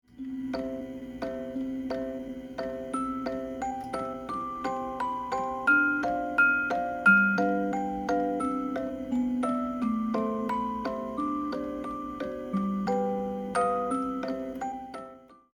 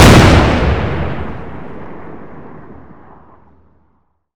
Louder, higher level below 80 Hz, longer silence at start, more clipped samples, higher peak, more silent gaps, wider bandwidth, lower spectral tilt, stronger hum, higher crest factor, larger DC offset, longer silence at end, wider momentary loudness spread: second, -29 LUFS vs -11 LUFS; second, -56 dBFS vs -22 dBFS; about the same, 0.1 s vs 0 s; second, under 0.1% vs 1%; second, -10 dBFS vs 0 dBFS; neither; about the same, 19 kHz vs over 20 kHz; about the same, -6.5 dB/octave vs -5.5 dB/octave; neither; first, 20 dB vs 14 dB; neither; second, 0.2 s vs 1.65 s; second, 13 LU vs 27 LU